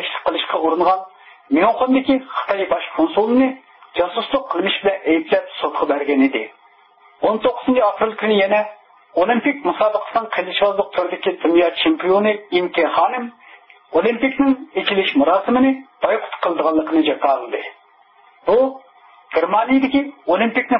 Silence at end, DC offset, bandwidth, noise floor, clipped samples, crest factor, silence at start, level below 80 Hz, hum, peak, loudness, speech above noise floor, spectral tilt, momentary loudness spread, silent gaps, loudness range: 0 s; under 0.1%; 5.6 kHz; -52 dBFS; under 0.1%; 14 dB; 0 s; -58 dBFS; none; -4 dBFS; -18 LUFS; 35 dB; -9.5 dB/octave; 6 LU; none; 2 LU